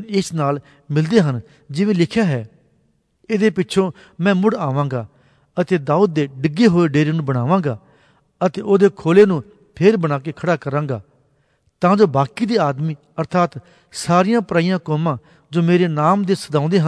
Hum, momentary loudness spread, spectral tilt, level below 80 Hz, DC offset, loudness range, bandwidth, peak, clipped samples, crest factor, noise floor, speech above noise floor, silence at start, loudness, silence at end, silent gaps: none; 11 LU; -7 dB/octave; -58 dBFS; under 0.1%; 3 LU; 11 kHz; -2 dBFS; under 0.1%; 16 dB; -62 dBFS; 45 dB; 0 s; -18 LUFS; 0 s; none